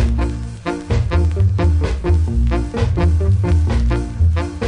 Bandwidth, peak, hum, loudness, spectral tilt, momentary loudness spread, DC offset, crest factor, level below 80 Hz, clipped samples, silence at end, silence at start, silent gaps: 10 kHz; -4 dBFS; none; -18 LUFS; -8 dB/octave; 5 LU; under 0.1%; 12 dB; -18 dBFS; under 0.1%; 0 s; 0 s; none